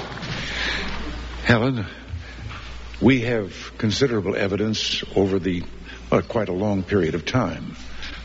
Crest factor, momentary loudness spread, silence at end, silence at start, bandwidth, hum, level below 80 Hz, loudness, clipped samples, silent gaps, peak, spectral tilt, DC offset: 20 dB; 16 LU; 0 s; 0 s; 8 kHz; none; -38 dBFS; -23 LUFS; under 0.1%; none; -2 dBFS; -4.5 dB/octave; under 0.1%